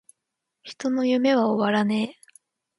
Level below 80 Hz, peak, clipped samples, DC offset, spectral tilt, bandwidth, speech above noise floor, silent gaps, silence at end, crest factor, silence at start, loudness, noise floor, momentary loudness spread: -72 dBFS; -8 dBFS; under 0.1%; under 0.1%; -6 dB/octave; 11.5 kHz; 60 dB; none; 0.65 s; 16 dB; 0.65 s; -23 LUFS; -83 dBFS; 11 LU